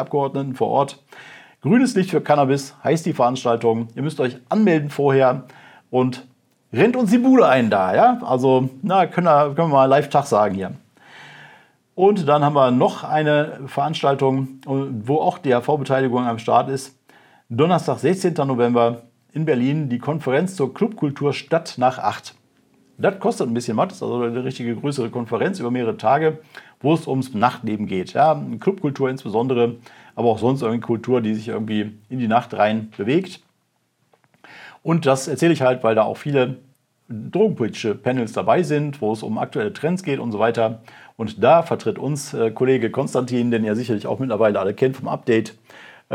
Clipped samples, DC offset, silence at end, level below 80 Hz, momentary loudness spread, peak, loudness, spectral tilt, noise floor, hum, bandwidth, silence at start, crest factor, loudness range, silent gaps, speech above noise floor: under 0.1%; under 0.1%; 0 s; -76 dBFS; 9 LU; -2 dBFS; -20 LUFS; -6.5 dB/octave; -68 dBFS; none; 15.5 kHz; 0 s; 18 dB; 5 LU; none; 49 dB